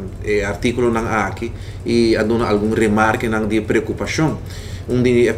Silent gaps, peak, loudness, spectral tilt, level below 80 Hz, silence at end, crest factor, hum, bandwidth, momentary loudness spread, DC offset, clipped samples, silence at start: none; 0 dBFS; -18 LUFS; -6 dB/octave; -36 dBFS; 0 s; 16 dB; none; 14.5 kHz; 12 LU; under 0.1%; under 0.1%; 0 s